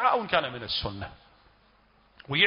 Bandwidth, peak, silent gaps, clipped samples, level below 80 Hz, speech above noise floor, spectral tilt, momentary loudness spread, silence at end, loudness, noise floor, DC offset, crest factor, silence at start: 5.4 kHz; -8 dBFS; none; under 0.1%; -52 dBFS; 31 dB; -8 dB/octave; 16 LU; 0 s; -29 LUFS; -62 dBFS; under 0.1%; 22 dB; 0 s